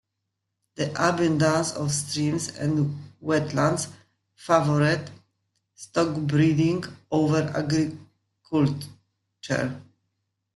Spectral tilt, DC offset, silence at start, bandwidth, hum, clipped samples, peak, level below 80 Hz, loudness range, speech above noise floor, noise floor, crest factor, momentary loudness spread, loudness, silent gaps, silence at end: -5.5 dB/octave; under 0.1%; 0.8 s; 12 kHz; none; under 0.1%; -4 dBFS; -60 dBFS; 3 LU; 57 dB; -81 dBFS; 22 dB; 14 LU; -25 LUFS; none; 0.75 s